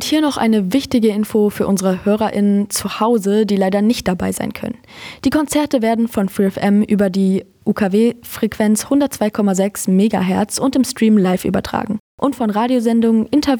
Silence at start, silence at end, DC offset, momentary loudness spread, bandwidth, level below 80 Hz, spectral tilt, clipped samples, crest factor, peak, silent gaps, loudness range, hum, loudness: 0 s; 0 s; under 0.1%; 7 LU; over 20 kHz; -46 dBFS; -5.5 dB/octave; under 0.1%; 12 dB; -4 dBFS; 12.00-12.18 s; 2 LU; none; -16 LUFS